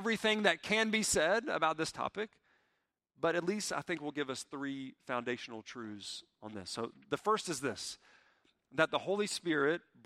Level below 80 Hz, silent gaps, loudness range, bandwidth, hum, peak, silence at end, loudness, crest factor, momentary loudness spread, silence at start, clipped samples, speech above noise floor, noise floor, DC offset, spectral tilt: -70 dBFS; none; 7 LU; 15.5 kHz; none; -12 dBFS; 0.25 s; -35 LUFS; 24 dB; 15 LU; 0 s; under 0.1%; 47 dB; -82 dBFS; under 0.1%; -3 dB/octave